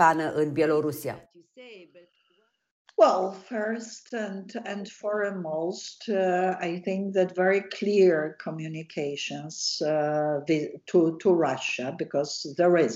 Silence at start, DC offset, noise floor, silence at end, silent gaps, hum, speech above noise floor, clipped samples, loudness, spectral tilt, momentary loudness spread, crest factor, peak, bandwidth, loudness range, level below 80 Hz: 0 s; under 0.1%; -70 dBFS; 0 s; 2.71-2.85 s; none; 44 dB; under 0.1%; -27 LUFS; -5 dB/octave; 14 LU; 20 dB; -8 dBFS; 15.5 kHz; 4 LU; -74 dBFS